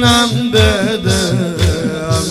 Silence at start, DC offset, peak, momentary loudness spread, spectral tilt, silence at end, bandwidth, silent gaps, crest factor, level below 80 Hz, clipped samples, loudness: 0 s; under 0.1%; 0 dBFS; 5 LU; -4.5 dB/octave; 0 s; 15.5 kHz; none; 12 dB; -30 dBFS; under 0.1%; -13 LUFS